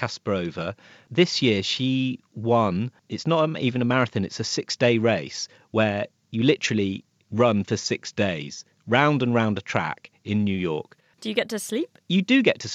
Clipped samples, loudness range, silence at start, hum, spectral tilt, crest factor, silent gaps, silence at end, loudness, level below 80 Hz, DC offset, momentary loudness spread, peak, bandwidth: under 0.1%; 1 LU; 0 s; none; -5 dB/octave; 20 dB; none; 0 s; -24 LUFS; -66 dBFS; under 0.1%; 12 LU; -4 dBFS; 14.5 kHz